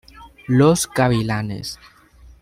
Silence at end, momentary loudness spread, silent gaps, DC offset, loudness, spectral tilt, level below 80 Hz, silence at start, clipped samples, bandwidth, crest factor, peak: 0.65 s; 19 LU; none; under 0.1%; -18 LUFS; -5.5 dB/octave; -46 dBFS; 0.15 s; under 0.1%; 16 kHz; 18 dB; -2 dBFS